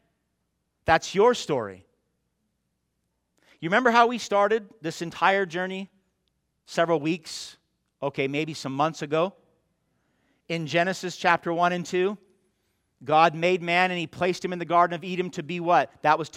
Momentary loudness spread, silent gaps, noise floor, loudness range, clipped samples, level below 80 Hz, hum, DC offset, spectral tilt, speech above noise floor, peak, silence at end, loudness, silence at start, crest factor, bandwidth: 13 LU; none; -77 dBFS; 5 LU; under 0.1%; -64 dBFS; none; under 0.1%; -5 dB/octave; 52 dB; -4 dBFS; 0 s; -25 LUFS; 0.85 s; 22 dB; 15 kHz